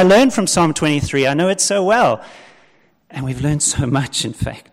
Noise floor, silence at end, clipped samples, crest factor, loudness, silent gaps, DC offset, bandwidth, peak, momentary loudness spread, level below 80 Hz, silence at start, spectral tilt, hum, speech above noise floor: -55 dBFS; 0.15 s; under 0.1%; 12 dB; -16 LUFS; none; under 0.1%; 16 kHz; -4 dBFS; 12 LU; -40 dBFS; 0 s; -4 dB/octave; none; 39 dB